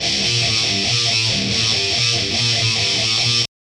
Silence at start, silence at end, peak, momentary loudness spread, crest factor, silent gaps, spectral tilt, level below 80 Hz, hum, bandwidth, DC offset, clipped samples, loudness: 0 s; 0.3 s; -4 dBFS; 1 LU; 14 dB; none; -2 dB/octave; -46 dBFS; none; 12 kHz; under 0.1%; under 0.1%; -15 LUFS